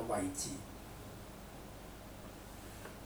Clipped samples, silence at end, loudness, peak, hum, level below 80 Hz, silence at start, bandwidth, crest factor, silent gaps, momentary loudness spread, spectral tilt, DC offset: under 0.1%; 0 s; -46 LUFS; -26 dBFS; 50 Hz at -55 dBFS; -56 dBFS; 0 s; over 20 kHz; 20 dB; none; 13 LU; -4 dB/octave; under 0.1%